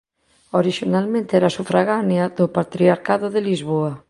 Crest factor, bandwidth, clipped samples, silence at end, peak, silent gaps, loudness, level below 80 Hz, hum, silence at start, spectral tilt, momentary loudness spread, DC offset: 18 dB; 11.5 kHz; under 0.1%; 0.1 s; -2 dBFS; none; -19 LUFS; -60 dBFS; none; 0.55 s; -7 dB/octave; 4 LU; under 0.1%